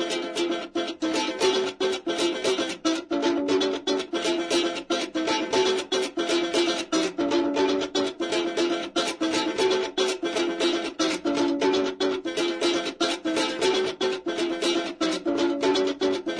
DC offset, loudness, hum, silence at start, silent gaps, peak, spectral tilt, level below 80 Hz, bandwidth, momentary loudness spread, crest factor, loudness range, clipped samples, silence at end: under 0.1%; -25 LUFS; none; 0 s; none; -12 dBFS; -2.5 dB/octave; -64 dBFS; 10.5 kHz; 4 LU; 14 dB; 1 LU; under 0.1%; 0 s